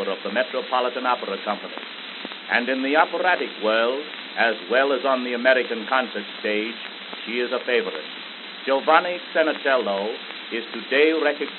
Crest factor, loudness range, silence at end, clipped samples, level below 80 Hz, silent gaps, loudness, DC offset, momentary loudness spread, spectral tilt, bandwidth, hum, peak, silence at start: 22 dB; 3 LU; 0 s; under 0.1%; under -90 dBFS; none; -23 LUFS; under 0.1%; 13 LU; 0 dB/octave; 4.4 kHz; none; -2 dBFS; 0 s